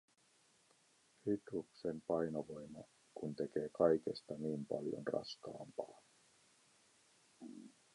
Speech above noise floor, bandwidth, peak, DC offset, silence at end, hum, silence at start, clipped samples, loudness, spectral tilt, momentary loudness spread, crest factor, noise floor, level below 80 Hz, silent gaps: 33 dB; 11.5 kHz; -18 dBFS; under 0.1%; 0.25 s; none; 1.25 s; under 0.1%; -42 LUFS; -6.5 dB/octave; 20 LU; 24 dB; -74 dBFS; -78 dBFS; none